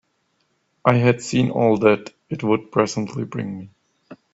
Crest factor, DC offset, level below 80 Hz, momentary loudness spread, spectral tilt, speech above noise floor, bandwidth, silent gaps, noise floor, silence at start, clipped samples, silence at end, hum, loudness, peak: 20 dB; under 0.1%; -58 dBFS; 13 LU; -6.5 dB/octave; 49 dB; 8 kHz; none; -68 dBFS; 0.85 s; under 0.1%; 0.2 s; none; -20 LUFS; 0 dBFS